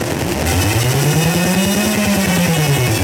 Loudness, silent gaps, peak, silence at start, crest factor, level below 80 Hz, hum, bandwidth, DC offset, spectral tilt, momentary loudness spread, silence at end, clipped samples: -15 LUFS; none; -2 dBFS; 0 s; 12 dB; -32 dBFS; none; over 20 kHz; under 0.1%; -4.5 dB/octave; 2 LU; 0 s; under 0.1%